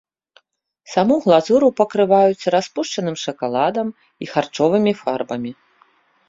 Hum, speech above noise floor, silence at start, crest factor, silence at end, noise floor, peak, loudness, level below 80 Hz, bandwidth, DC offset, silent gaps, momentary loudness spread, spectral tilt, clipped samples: none; 45 dB; 0.9 s; 18 dB; 0.75 s; -63 dBFS; -2 dBFS; -18 LUFS; -62 dBFS; 7.8 kHz; under 0.1%; none; 11 LU; -5.5 dB/octave; under 0.1%